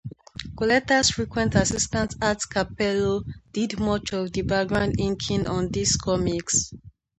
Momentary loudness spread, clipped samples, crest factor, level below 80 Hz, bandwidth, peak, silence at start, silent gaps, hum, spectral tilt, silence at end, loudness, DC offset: 8 LU; under 0.1%; 20 dB; -42 dBFS; 9.2 kHz; -6 dBFS; 0.05 s; none; none; -4 dB/octave; 0.3 s; -24 LUFS; under 0.1%